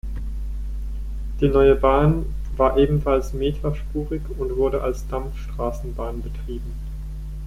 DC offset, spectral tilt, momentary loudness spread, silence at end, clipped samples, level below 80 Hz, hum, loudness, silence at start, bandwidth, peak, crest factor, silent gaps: under 0.1%; -8 dB/octave; 15 LU; 0 s; under 0.1%; -28 dBFS; none; -23 LUFS; 0.05 s; 13 kHz; -4 dBFS; 18 dB; none